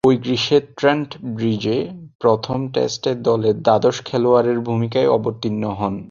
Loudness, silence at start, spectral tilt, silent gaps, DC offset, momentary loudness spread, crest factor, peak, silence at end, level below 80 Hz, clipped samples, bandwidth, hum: -19 LUFS; 0.05 s; -6 dB/octave; 2.15-2.19 s; under 0.1%; 7 LU; 18 dB; 0 dBFS; 0.05 s; -52 dBFS; under 0.1%; 7.4 kHz; none